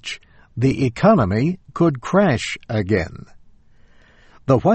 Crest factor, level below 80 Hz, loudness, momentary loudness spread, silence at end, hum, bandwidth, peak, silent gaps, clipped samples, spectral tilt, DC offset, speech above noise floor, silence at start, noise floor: 18 dB; -44 dBFS; -19 LUFS; 16 LU; 0 s; none; 8.8 kHz; -2 dBFS; none; under 0.1%; -7 dB/octave; under 0.1%; 32 dB; 0.05 s; -49 dBFS